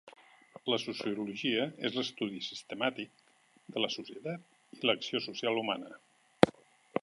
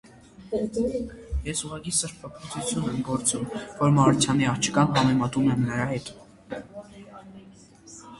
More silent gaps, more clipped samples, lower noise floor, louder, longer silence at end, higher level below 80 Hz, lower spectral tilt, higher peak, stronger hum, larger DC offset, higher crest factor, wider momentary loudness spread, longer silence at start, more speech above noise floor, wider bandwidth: neither; neither; first, -57 dBFS vs -50 dBFS; second, -34 LUFS vs -25 LUFS; about the same, 0 s vs 0 s; second, -70 dBFS vs -44 dBFS; about the same, -4.5 dB/octave vs -5 dB/octave; first, -2 dBFS vs -6 dBFS; neither; neither; first, 34 dB vs 20 dB; second, 13 LU vs 23 LU; second, 0.05 s vs 0.4 s; about the same, 22 dB vs 25 dB; about the same, 11.5 kHz vs 11.5 kHz